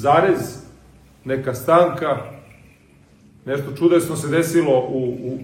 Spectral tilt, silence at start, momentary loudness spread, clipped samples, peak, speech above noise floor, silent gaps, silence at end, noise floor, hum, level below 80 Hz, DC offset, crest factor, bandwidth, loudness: -6 dB/octave; 0 s; 17 LU; under 0.1%; -2 dBFS; 33 dB; none; 0 s; -51 dBFS; none; -54 dBFS; under 0.1%; 18 dB; 16.5 kHz; -19 LUFS